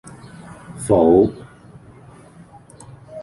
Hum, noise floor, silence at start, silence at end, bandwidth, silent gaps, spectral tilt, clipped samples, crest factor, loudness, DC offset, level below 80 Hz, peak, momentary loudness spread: none; -44 dBFS; 0.7 s; 0 s; 11.5 kHz; none; -7.5 dB/octave; under 0.1%; 20 dB; -16 LUFS; under 0.1%; -46 dBFS; -2 dBFS; 27 LU